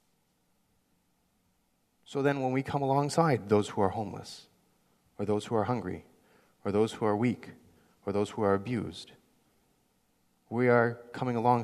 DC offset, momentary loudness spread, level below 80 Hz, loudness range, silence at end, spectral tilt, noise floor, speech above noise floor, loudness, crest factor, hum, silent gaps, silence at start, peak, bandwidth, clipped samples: under 0.1%; 16 LU; -68 dBFS; 4 LU; 0 s; -6.5 dB/octave; -73 dBFS; 44 dB; -30 LUFS; 22 dB; none; none; 2.1 s; -10 dBFS; 13.5 kHz; under 0.1%